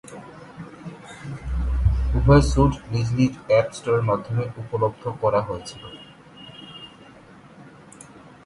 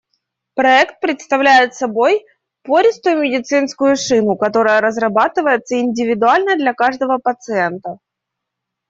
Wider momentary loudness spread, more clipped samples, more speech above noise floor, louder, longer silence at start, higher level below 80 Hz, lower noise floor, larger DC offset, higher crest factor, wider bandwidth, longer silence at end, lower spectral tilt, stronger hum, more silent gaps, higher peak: first, 24 LU vs 7 LU; neither; second, 26 dB vs 65 dB; second, -22 LUFS vs -15 LUFS; second, 0.05 s vs 0.55 s; first, -30 dBFS vs -62 dBFS; second, -47 dBFS vs -79 dBFS; neither; first, 22 dB vs 14 dB; first, 11.5 kHz vs 7.8 kHz; second, 0.25 s vs 0.95 s; first, -7 dB/octave vs -4 dB/octave; neither; neither; about the same, -2 dBFS vs -2 dBFS